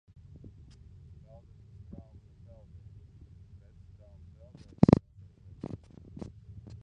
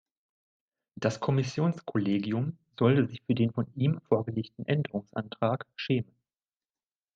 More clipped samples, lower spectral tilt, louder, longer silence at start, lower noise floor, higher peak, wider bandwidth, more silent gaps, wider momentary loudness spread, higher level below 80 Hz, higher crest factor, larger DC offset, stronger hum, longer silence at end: neither; first, -9.5 dB/octave vs -7.5 dB/octave; first, -27 LUFS vs -30 LUFS; first, 4.8 s vs 1 s; second, -54 dBFS vs under -90 dBFS; first, -4 dBFS vs -10 dBFS; first, 8.6 kHz vs 7.8 kHz; neither; first, 28 LU vs 8 LU; first, -52 dBFS vs -68 dBFS; first, 32 dB vs 20 dB; neither; neither; about the same, 1.05 s vs 1.15 s